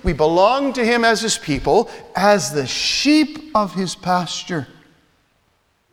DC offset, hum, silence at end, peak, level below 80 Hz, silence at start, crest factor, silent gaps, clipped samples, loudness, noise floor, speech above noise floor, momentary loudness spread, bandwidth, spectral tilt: under 0.1%; none; 1.25 s; -2 dBFS; -38 dBFS; 0.05 s; 18 dB; none; under 0.1%; -18 LUFS; -63 dBFS; 45 dB; 9 LU; 17.5 kHz; -4 dB/octave